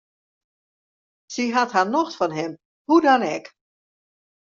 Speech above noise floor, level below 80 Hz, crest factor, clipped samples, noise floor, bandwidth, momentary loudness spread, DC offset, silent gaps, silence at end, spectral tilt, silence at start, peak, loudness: over 70 dB; -72 dBFS; 20 dB; under 0.1%; under -90 dBFS; 7.4 kHz; 16 LU; under 0.1%; 2.65-2.85 s; 1.05 s; -3 dB/octave; 1.3 s; -4 dBFS; -21 LUFS